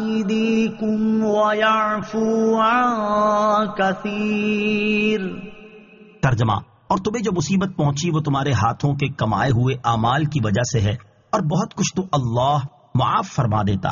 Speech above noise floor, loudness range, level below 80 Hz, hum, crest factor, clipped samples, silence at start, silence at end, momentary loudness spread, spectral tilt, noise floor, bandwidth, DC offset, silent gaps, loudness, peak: 26 dB; 3 LU; -46 dBFS; none; 14 dB; under 0.1%; 0 s; 0 s; 6 LU; -5.5 dB/octave; -45 dBFS; 7.2 kHz; under 0.1%; none; -20 LUFS; -6 dBFS